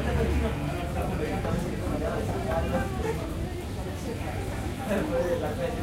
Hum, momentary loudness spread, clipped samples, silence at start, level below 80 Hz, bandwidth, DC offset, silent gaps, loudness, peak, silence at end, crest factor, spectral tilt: none; 6 LU; under 0.1%; 0 s; -36 dBFS; 16 kHz; under 0.1%; none; -30 LUFS; -16 dBFS; 0 s; 14 dB; -6.5 dB/octave